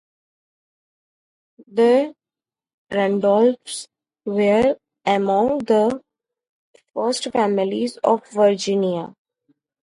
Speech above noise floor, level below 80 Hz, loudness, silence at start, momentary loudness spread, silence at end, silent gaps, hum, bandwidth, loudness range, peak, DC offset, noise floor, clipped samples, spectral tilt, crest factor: over 72 dB; -60 dBFS; -20 LUFS; 1.6 s; 13 LU; 0.9 s; 2.74-2.87 s, 6.49-6.74 s; none; 11.5 kHz; 2 LU; -4 dBFS; under 0.1%; under -90 dBFS; under 0.1%; -5 dB/octave; 18 dB